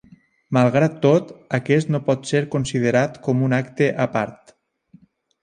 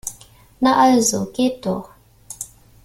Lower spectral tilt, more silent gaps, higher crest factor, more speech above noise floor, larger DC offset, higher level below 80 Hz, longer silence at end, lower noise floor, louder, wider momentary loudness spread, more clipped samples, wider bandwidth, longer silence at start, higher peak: first, -7 dB/octave vs -3.5 dB/octave; neither; about the same, 18 dB vs 18 dB; first, 34 dB vs 29 dB; neither; about the same, -56 dBFS vs -52 dBFS; first, 1.1 s vs 0.4 s; first, -53 dBFS vs -46 dBFS; about the same, -20 LUFS vs -18 LUFS; second, 6 LU vs 19 LU; neither; second, 10 kHz vs 16 kHz; first, 0.5 s vs 0.05 s; about the same, -2 dBFS vs -4 dBFS